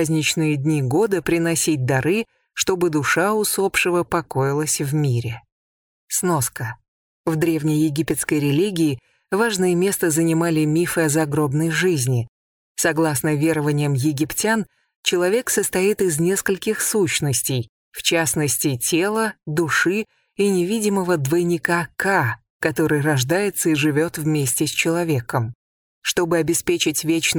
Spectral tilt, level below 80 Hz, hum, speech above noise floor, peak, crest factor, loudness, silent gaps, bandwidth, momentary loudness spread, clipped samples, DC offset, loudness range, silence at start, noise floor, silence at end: -4.5 dB/octave; -54 dBFS; none; over 70 dB; -2 dBFS; 18 dB; -20 LUFS; 5.52-6.08 s, 6.88-7.24 s, 12.28-12.75 s, 14.96-15.03 s, 17.69-17.92 s, 22.50-22.60 s, 25.55-26.02 s; over 20 kHz; 6 LU; under 0.1%; under 0.1%; 2 LU; 0 s; under -90 dBFS; 0 s